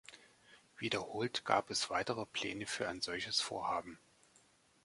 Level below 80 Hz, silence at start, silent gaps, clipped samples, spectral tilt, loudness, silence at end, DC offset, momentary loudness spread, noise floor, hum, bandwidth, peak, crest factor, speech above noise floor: -72 dBFS; 0.1 s; none; under 0.1%; -2.5 dB/octave; -38 LUFS; 0.9 s; under 0.1%; 7 LU; -69 dBFS; none; 11.5 kHz; -14 dBFS; 26 dB; 31 dB